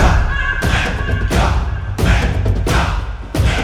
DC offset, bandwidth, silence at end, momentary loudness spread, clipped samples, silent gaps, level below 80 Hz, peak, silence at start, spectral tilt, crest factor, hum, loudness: under 0.1%; 16 kHz; 0 s; 5 LU; under 0.1%; none; -18 dBFS; 0 dBFS; 0 s; -5.5 dB/octave; 14 dB; none; -17 LUFS